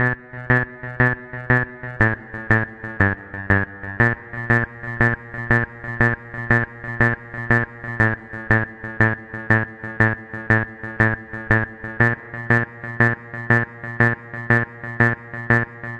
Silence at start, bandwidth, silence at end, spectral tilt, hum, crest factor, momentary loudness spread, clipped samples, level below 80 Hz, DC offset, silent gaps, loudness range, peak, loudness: 0 s; 7.4 kHz; 0 s; -8.5 dB/octave; none; 20 dB; 9 LU; under 0.1%; -42 dBFS; under 0.1%; none; 1 LU; 0 dBFS; -21 LUFS